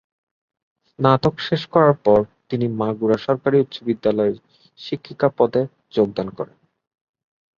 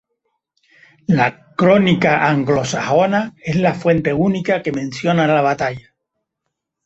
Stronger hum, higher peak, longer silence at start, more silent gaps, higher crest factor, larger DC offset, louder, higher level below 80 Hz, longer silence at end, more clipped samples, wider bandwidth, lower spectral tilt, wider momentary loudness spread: neither; about the same, -2 dBFS vs -2 dBFS; about the same, 1 s vs 1.1 s; neither; about the same, 20 dB vs 16 dB; neither; second, -20 LUFS vs -16 LUFS; about the same, -56 dBFS vs -52 dBFS; about the same, 1.15 s vs 1.05 s; neither; second, 7 kHz vs 8.2 kHz; first, -8.5 dB/octave vs -6.5 dB/octave; first, 14 LU vs 8 LU